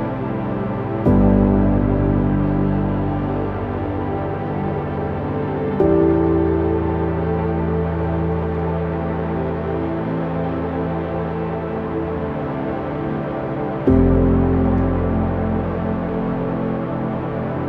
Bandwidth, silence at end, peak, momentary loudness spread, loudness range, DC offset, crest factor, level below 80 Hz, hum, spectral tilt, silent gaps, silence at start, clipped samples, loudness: 4.9 kHz; 0 s; -2 dBFS; 8 LU; 5 LU; under 0.1%; 16 dB; -30 dBFS; none; -11 dB/octave; none; 0 s; under 0.1%; -20 LUFS